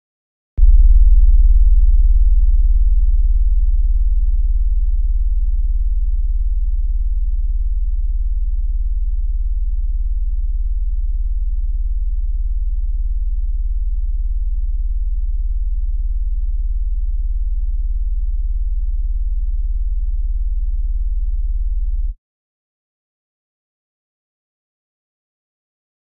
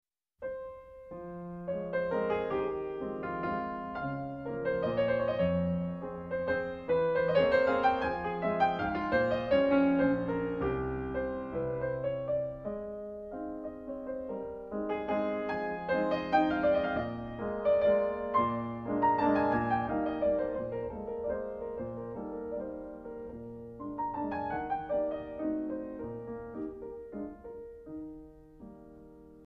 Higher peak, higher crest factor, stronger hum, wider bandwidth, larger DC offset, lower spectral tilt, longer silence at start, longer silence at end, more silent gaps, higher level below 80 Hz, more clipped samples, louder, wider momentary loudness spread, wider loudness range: first, -2 dBFS vs -14 dBFS; about the same, 14 dB vs 18 dB; neither; second, 0.2 kHz vs 6 kHz; first, 3% vs under 0.1%; first, -22 dB/octave vs -8.5 dB/octave; first, 0.55 s vs 0.4 s; first, 3.8 s vs 0 s; neither; first, -16 dBFS vs -54 dBFS; neither; first, -21 LUFS vs -32 LUFS; second, 8 LU vs 16 LU; about the same, 8 LU vs 9 LU